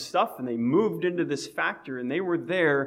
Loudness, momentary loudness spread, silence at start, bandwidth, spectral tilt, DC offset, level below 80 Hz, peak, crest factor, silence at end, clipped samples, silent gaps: -27 LUFS; 6 LU; 0 s; 16 kHz; -5.5 dB/octave; under 0.1%; -74 dBFS; -12 dBFS; 16 dB; 0 s; under 0.1%; none